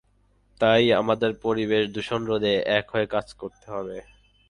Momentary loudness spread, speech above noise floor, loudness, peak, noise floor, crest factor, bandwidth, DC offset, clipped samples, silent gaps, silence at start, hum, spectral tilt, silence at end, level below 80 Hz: 16 LU; 39 dB; -24 LUFS; -6 dBFS; -63 dBFS; 18 dB; 10.5 kHz; under 0.1%; under 0.1%; none; 0.6 s; none; -6 dB/octave; 0.5 s; -56 dBFS